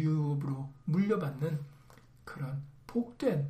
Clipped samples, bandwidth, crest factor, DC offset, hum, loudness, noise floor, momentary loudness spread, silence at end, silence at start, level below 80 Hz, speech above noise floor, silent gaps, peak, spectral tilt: under 0.1%; 12.5 kHz; 16 dB; under 0.1%; none; -34 LUFS; -58 dBFS; 14 LU; 0 s; 0 s; -64 dBFS; 24 dB; none; -18 dBFS; -9 dB/octave